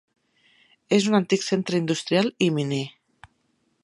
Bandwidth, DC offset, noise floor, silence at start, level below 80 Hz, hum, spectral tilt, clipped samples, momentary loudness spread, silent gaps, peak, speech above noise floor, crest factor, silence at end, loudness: 11.5 kHz; under 0.1%; -70 dBFS; 0.9 s; -70 dBFS; none; -5 dB/octave; under 0.1%; 7 LU; none; -4 dBFS; 47 dB; 20 dB; 0.95 s; -23 LUFS